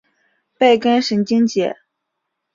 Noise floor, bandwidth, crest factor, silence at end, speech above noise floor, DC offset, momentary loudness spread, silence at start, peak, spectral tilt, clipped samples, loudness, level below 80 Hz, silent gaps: -76 dBFS; 7.6 kHz; 16 dB; 0.8 s; 61 dB; under 0.1%; 9 LU; 0.6 s; -2 dBFS; -5 dB/octave; under 0.1%; -16 LUFS; -64 dBFS; none